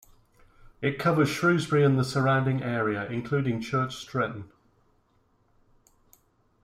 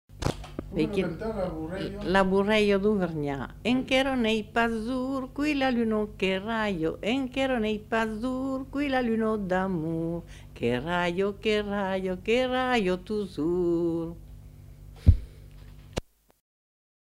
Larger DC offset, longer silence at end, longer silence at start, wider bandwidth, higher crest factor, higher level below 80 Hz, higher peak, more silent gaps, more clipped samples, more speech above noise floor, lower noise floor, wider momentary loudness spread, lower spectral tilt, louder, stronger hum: neither; first, 2.2 s vs 1.2 s; first, 0.8 s vs 0.1 s; about the same, 15 kHz vs 15.5 kHz; second, 18 dB vs 24 dB; second, -60 dBFS vs -40 dBFS; second, -10 dBFS vs -4 dBFS; neither; neither; first, 41 dB vs 20 dB; first, -67 dBFS vs -47 dBFS; about the same, 8 LU vs 9 LU; about the same, -6.5 dB/octave vs -6.5 dB/octave; about the same, -26 LUFS vs -28 LUFS; second, none vs 50 Hz at -70 dBFS